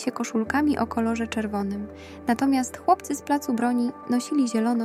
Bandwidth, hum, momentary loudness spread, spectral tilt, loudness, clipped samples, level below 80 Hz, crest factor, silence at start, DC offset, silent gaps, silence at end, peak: 14.5 kHz; none; 6 LU; -5 dB/octave; -25 LUFS; under 0.1%; -54 dBFS; 16 dB; 0 s; under 0.1%; none; 0 s; -8 dBFS